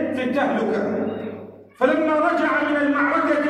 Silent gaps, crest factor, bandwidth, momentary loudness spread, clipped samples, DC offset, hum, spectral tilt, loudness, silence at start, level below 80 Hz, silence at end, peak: none; 14 dB; 10 kHz; 9 LU; under 0.1%; under 0.1%; none; -6.5 dB/octave; -21 LUFS; 0 s; -68 dBFS; 0 s; -6 dBFS